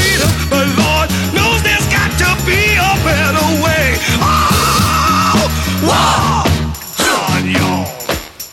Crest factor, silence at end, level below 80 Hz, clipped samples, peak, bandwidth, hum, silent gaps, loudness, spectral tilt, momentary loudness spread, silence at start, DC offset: 12 dB; 0 s; -24 dBFS; under 0.1%; 0 dBFS; 19.5 kHz; none; none; -12 LUFS; -4 dB/octave; 5 LU; 0 s; under 0.1%